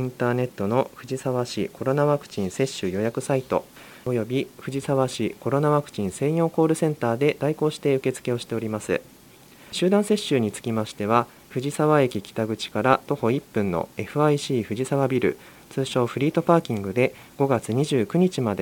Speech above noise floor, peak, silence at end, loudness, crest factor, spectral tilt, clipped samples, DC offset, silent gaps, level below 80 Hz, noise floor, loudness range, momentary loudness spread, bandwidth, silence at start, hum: 26 dB; -2 dBFS; 0 s; -24 LUFS; 22 dB; -6 dB/octave; under 0.1%; under 0.1%; none; -62 dBFS; -50 dBFS; 2 LU; 7 LU; 17 kHz; 0 s; none